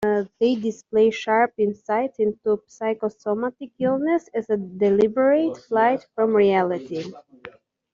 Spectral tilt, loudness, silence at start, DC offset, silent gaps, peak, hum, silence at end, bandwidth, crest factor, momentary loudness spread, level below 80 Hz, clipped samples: -6.5 dB/octave; -22 LUFS; 0 s; under 0.1%; none; -6 dBFS; none; 0.45 s; 7.4 kHz; 16 dB; 8 LU; -64 dBFS; under 0.1%